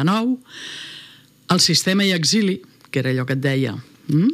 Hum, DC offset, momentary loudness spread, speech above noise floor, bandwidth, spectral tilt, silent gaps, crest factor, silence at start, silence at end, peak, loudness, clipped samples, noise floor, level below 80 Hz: none; under 0.1%; 18 LU; 27 dB; 16 kHz; -4.5 dB/octave; none; 16 dB; 0 s; 0 s; -4 dBFS; -19 LUFS; under 0.1%; -46 dBFS; -68 dBFS